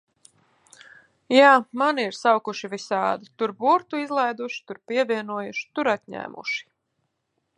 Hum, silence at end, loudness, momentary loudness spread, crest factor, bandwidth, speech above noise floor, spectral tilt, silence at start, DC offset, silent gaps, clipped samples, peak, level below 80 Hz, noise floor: none; 0.95 s; -23 LUFS; 15 LU; 22 dB; 11 kHz; 53 dB; -4 dB/octave; 1.3 s; under 0.1%; none; under 0.1%; -2 dBFS; -78 dBFS; -76 dBFS